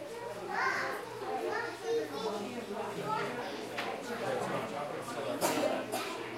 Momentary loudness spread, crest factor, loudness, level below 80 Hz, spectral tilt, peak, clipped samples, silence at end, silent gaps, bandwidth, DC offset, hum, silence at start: 7 LU; 18 dB; -36 LUFS; -74 dBFS; -3.5 dB/octave; -18 dBFS; under 0.1%; 0 s; none; 16 kHz; under 0.1%; none; 0 s